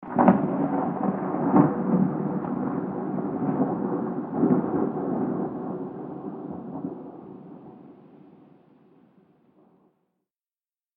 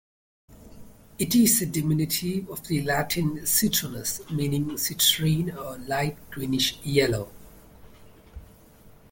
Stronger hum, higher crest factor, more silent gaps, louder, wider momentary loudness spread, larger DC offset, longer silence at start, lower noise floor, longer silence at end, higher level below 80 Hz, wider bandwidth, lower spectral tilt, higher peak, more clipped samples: neither; first, 26 dB vs 20 dB; neither; about the same, -26 LUFS vs -24 LUFS; first, 17 LU vs 11 LU; neither; second, 0 s vs 0.5 s; first, under -90 dBFS vs -52 dBFS; first, 2.8 s vs 0.25 s; second, -64 dBFS vs -50 dBFS; second, 3.2 kHz vs 17 kHz; first, -13.5 dB/octave vs -3.5 dB/octave; first, -2 dBFS vs -8 dBFS; neither